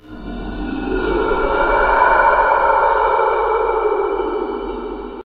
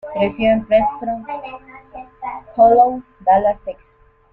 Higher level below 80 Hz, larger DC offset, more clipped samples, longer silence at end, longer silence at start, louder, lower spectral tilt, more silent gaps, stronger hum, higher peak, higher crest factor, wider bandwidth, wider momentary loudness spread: first, -32 dBFS vs -46 dBFS; neither; neither; second, 0 s vs 0.6 s; about the same, 0.05 s vs 0.05 s; about the same, -16 LUFS vs -16 LUFS; about the same, -8.5 dB/octave vs -8.5 dB/octave; neither; neither; about the same, -2 dBFS vs -2 dBFS; about the same, 16 dB vs 16 dB; first, 4.9 kHz vs 4.3 kHz; second, 14 LU vs 23 LU